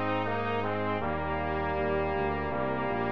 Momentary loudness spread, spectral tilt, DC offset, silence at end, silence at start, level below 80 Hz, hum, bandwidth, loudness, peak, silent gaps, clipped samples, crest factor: 2 LU; -8.5 dB/octave; 0.8%; 0 s; 0 s; -46 dBFS; none; 6.2 kHz; -30 LUFS; -18 dBFS; none; under 0.1%; 12 dB